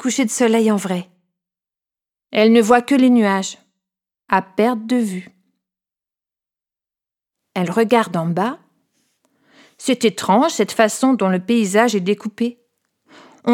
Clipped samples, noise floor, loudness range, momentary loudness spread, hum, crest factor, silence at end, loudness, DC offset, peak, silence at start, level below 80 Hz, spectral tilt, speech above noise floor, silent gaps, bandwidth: under 0.1%; -90 dBFS; 7 LU; 12 LU; none; 18 dB; 0 s; -17 LUFS; under 0.1%; 0 dBFS; 0 s; -68 dBFS; -5 dB/octave; 73 dB; none; 16 kHz